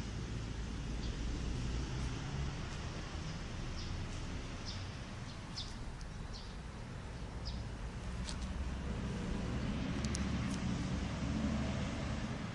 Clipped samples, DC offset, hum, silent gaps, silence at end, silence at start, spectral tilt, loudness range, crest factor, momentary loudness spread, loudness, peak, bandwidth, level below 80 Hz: under 0.1%; under 0.1%; none; none; 0 s; 0 s; -5.5 dB/octave; 7 LU; 22 dB; 9 LU; -42 LUFS; -18 dBFS; 11.5 kHz; -44 dBFS